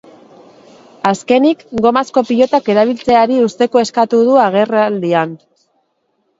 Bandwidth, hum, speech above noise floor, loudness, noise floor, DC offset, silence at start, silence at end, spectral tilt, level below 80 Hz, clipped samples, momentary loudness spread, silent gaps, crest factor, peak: 8 kHz; none; 52 dB; -13 LUFS; -64 dBFS; under 0.1%; 1.05 s; 1.05 s; -5.5 dB/octave; -56 dBFS; under 0.1%; 6 LU; none; 14 dB; 0 dBFS